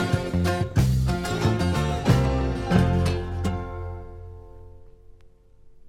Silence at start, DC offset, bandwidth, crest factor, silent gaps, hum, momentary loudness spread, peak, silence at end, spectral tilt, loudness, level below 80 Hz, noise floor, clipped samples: 0 s; under 0.1%; 16 kHz; 18 dB; none; none; 17 LU; -6 dBFS; 0 s; -6.5 dB/octave; -24 LUFS; -34 dBFS; -51 dBFS; under 0.1%